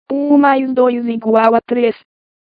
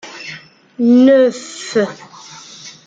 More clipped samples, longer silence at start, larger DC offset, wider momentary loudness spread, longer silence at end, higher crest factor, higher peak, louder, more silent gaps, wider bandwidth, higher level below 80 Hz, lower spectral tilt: neither; about the same, 0.1 s vs 0.05 s; neither; second, 7 LU vs 25 LU; first, 0.65 s vs 0.15 s; about the same, 14 dB vs 14 dB; about the same, 0 dBFS vs -2 dBFS; about the same, -13 LUFS vs -13 LUFS; neither; second, 5 kHz vs 9 kHz; about the same, -64 dBFS vs -64 dBFS; first, -8 dB/octave vs -5 dB/octave